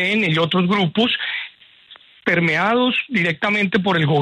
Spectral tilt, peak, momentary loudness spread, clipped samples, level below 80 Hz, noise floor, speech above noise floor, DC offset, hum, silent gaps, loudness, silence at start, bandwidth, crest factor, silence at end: -6.5 dB/octave; -6 dBFS; 7 LU; under 0.1%; -58 dBFS; -47 dBFS; 29 dB; under 0.1%; none; none; -18 LUFS; 0 s; 10 kHz; 14 dB; 0 s